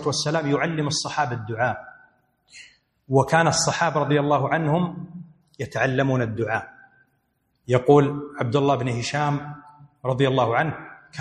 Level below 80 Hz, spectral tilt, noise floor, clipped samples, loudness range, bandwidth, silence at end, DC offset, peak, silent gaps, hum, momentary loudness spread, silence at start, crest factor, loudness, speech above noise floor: -58 dBFS; -5 dB/octave; -70 dBFS; under 0.1%; 3 LU; 12 kHz; 0 s; under 0.1%; -2 dBFS; none; none; 17 LU; 0 s; 20 dB; -22 LUFS; 48 dB